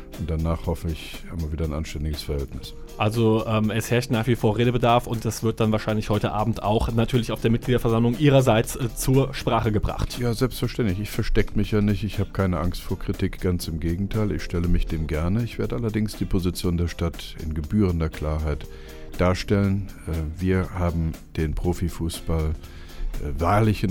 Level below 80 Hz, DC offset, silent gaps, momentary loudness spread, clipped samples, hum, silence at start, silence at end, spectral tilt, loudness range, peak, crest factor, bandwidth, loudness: -32 dBFS; under 0.1%; none; 10 LU; under 0.1%; none; 0 s; 0 s; -6.5 dB/octave; 5 LU; -6 dBFS; 18 dB; 17.5 kHz; -24 LUFS